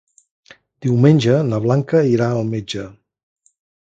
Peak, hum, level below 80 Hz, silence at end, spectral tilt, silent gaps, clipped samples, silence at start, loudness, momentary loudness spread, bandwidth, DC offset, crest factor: 0 dBFS; none; -54 dBFS; 0.9 s; -7.5 dB/octave; none; under 0.1%; 0.8 s; -17 LUFS; 14 LU; 8 kHz; under 0.1%; 18 dB